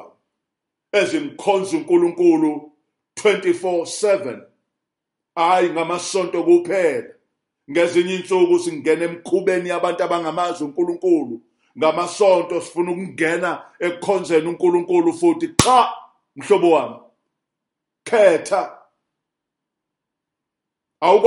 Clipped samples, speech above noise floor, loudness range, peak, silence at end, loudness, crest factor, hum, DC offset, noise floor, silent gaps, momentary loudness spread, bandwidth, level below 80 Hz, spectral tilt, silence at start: under 0.1%; 64 dB; 3 LU; 0 dBFS; 0 s; -19 LUFS; 20 dB; none; under 0.1%; -82 dBFS; none; 9 LU; 11.5 kHz; -54 dBFS; -4.5 dB/octave; 0 s